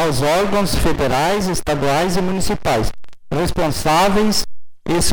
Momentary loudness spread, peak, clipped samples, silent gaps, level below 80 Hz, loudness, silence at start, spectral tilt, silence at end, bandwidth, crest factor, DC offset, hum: 7 LU; -4 dBFS; under 0.1%; none; -30 dBFS; -18 LUFS; 0 s; -4.5 dB/octave; 0 s; over 20 kHz; 12 dB; under 0.1%; none